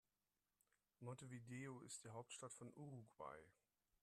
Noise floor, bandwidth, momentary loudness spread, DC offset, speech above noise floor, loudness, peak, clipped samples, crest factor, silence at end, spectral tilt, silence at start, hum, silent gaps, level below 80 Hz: under -90 dBFS; 13.5 kHz; 5 LU; under 0.1%; over 33 dB; -57 LUFS; -42 dBFS; under 0.1%; 16 dB; 0.5 s; -4.5 dB/octave; 1 s; none; none; -88 dBFS